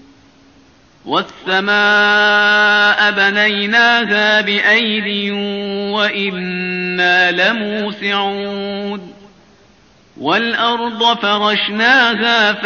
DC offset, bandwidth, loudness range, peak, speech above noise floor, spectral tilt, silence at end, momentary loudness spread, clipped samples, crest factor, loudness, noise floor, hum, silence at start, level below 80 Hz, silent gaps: under 0.1%; 7 kHz; 7 LU; 0 dBFS; 35 dB; -0.5 dB/octave; 0 s; 10 LU; under 0.1%; 14 dB; -13 LUFS; -49 dBFS; none; 1.05 s; -60 dBFS; none